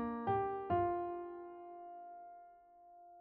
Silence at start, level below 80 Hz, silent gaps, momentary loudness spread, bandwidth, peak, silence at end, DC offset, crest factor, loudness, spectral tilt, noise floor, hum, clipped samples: 0 s; -68 dBFS; none; 23 LU; 4.2 kHz; -24 dBFS; 0 s; under 0.1%; 16 dB; -39 LUFS; -7 dB/octave; -61 dBFS; none; under 0.1%